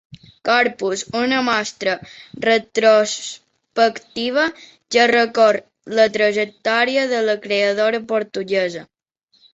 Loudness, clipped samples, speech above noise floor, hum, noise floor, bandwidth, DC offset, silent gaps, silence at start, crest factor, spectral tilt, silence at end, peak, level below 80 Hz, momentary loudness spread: -18 LUFS; under 0.1%; 44 dB; none; -62 dBFS; 8 kHz; under 0.1%; none; 0.45 s; 18 dB; -3 dB/octave; 0.7 s; -2 dBFS; -64 dBFS; 11 LU